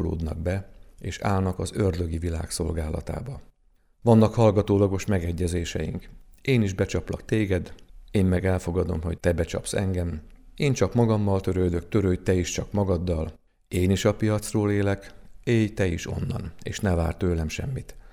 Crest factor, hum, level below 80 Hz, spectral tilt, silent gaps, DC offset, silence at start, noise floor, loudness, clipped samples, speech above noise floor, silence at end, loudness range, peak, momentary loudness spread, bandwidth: 20 dB; none; -40 dBFS; -6.5 dB/octave; none; under 0.1%; 0 s; -61 dBFS; -26 LUFS; under 0.1%; 37 dB; 0 s; 3 LU; -6 dBFS; 11 LU; 14.5 kHz